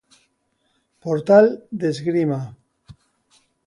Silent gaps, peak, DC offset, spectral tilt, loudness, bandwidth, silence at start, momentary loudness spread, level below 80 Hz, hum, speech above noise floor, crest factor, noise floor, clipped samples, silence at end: none; -2 dBFS; under 0.1%; -7.5 dB/octave; -19 LUFS; 11 kHz; 1.05 s; 17 LU; -64 dBFS; none; 51 dB; 20 dB; -69 dBFS; under 0.1%; 0.75 s